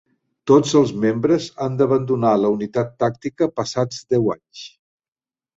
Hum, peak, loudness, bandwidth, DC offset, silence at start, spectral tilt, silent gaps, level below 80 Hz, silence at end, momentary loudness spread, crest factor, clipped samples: none; -2 dBFS; -19 LUFS; 8 kHz; under 0.1%; 0.45 s; -6.5 dB/octave; none; -56 dBFS; 0.9 s; 12 LU; 18 dB; under 0.1%